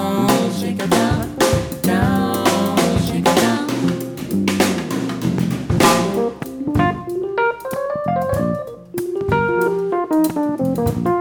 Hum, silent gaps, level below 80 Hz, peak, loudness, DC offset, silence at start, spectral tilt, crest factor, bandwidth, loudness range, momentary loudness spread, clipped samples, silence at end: none; none; -38 dBFS; -2 dBFS; -18 LUFS; under 0.1%; 0 s; -5.5 dB/octave; 16 dB; over 20 kHz; 3 LU; 7 LU; under 0.1%; 0 s